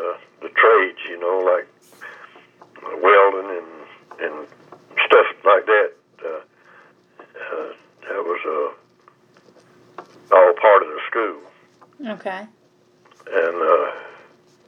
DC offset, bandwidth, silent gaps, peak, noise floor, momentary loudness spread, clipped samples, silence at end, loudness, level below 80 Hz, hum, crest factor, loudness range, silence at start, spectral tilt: under 0.1%; 6.4 kHz; none; 0 dBFS; -56 dBFS; 22 LU; under 0.1%; 0.55 s; -18 LUFS; -86 dBFS; none; 20 dB; 11 LU; 0 s; -4.5 dB/octave